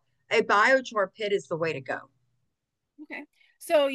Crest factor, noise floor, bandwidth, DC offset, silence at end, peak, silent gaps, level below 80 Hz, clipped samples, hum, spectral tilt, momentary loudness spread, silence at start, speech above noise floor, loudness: 18 dB; -83 dBFS; 12.5 kHz; under 0.1%; 0 s; -10 dBFS; none; -80 dBFS; under 0.1%; none; -4 dB/octave; 20 LU; 0.3 s; 57 dB; -26 LUFS